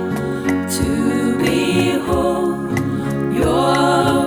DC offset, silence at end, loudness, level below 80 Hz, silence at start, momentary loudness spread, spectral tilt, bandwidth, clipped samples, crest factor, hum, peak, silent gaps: under 0.1%; 0 s; -17 LUFS; -36 dBFS; 0 s; 6 LU; -5.5 dB/octave; over 20 kHz; under 0.1%; 14 dB; none; -4 dBFS; none